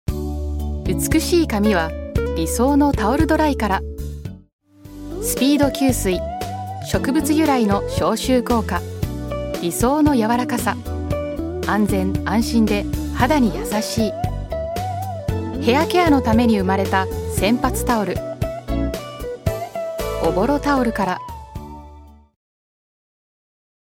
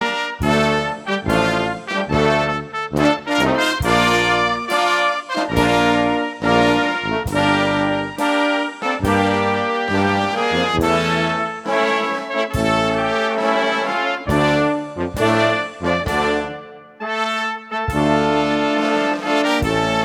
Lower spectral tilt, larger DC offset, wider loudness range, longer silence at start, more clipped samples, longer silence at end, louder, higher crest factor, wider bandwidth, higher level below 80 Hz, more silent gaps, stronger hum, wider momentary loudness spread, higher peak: about the same, -5.5 dB/octave vs -5 dB/octave; neither; about the same, 4 LU vs 3 LU; about the same, 0.1 s vs 0 s; neither; first, 1.7 s vs 0 s; about the same, -20 LUFS vs -18 LUFS; about the same, 20 dB vs 18 dB; about the same, 17 kHz vs 16.5 kHz; first, -32 dBFS vs -38 dBFS; first, 4.53-4.59 s vs none; neither; first, 11 LU vs 6 LU; about the same, 0 dBFS vs -2 dBFS